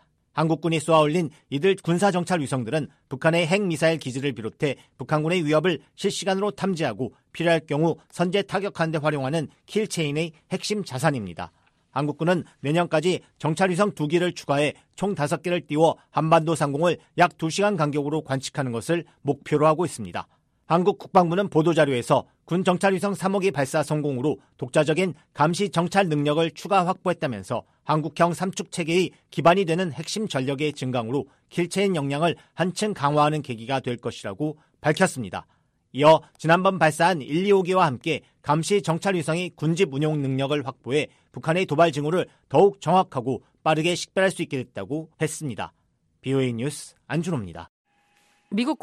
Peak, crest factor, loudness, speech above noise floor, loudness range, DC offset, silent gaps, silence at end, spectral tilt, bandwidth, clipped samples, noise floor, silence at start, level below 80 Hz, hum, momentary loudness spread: -6 dBFS; 18 dB; -24 LUFS; 41 dB; 4 LU; under 0.1%; 47.69-47.85 s; 0.05 s; -5.5 dB/octave; 13.5 kHz; under 0.1%; -64 dBFS; 0.35 s; -62 dBFS; none; 10 LU